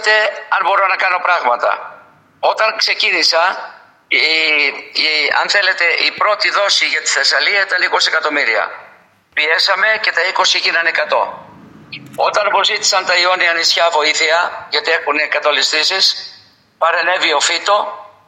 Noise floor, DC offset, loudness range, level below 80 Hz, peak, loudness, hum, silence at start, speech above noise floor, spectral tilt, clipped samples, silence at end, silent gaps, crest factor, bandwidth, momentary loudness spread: -47 dBFS; under 0.1%; 2 LU; -72 dBFS; 0 dBFS; -13 LUFS; none; 0 s; 32 dB; 1 dB/octave; under 0.1%; 0.2 s; none; 16 dB; 16 kHz; 7 LU